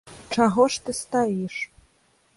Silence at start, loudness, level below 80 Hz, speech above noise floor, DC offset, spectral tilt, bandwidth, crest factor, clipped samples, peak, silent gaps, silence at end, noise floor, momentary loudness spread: 0.05 s; -24 LUFS; -58 dBFS; 41 dB; under 0.1%; -4.5 dB/octave; 11.5 kHz; 18 dB; under 0.1%; -6 dBFS; none; 0.7 s; -63 dBFS; 12 LU